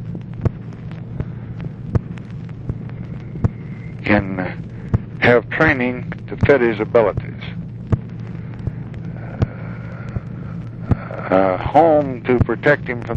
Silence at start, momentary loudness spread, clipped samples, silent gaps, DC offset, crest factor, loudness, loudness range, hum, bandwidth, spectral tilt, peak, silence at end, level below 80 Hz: 0 s; 16 LU; under 0.1%; none; under 0.1%; 18 dB; -20 LUFS; 10 LU; none; 7.2 kHz; -9 dB/octave; -2 dBFS; 0 s; -36 dBFS